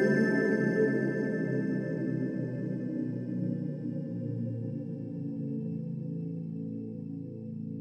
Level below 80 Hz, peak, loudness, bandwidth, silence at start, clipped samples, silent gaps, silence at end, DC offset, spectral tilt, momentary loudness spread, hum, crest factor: -74 dBFS; -14 dBFS; -33 LUFS; 9.4 kHz; 0 s; under 0.1%; none; 0 s; under 0.1%; -9 dB/octave; 11 LU; none; 16 dB